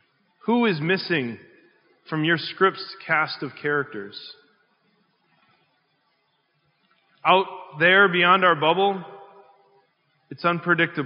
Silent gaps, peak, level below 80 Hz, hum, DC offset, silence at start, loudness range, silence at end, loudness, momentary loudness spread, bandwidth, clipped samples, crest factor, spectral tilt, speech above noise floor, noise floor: none; -2 dBFS; -82 dBFS; none; under 0.1%; 0.45 s; 10 LU; 0 s; -21 LUFS; 18 LU; 5.4 kHz; under 0.1%; 22 dB; -2.5 dB/octave; 48 dB; -69 dBFS